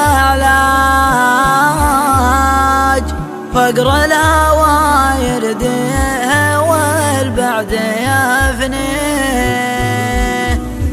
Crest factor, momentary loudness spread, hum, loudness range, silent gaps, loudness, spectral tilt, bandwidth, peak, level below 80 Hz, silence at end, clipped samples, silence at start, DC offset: 12 dB; 6 LU; none; 3 LU; none; -12 LUFS; -4.5 dB/octave; 15 kHz; 0 dBFS; -22 dBFS; 0 s; under 0.1%; 0 s; under 0.1%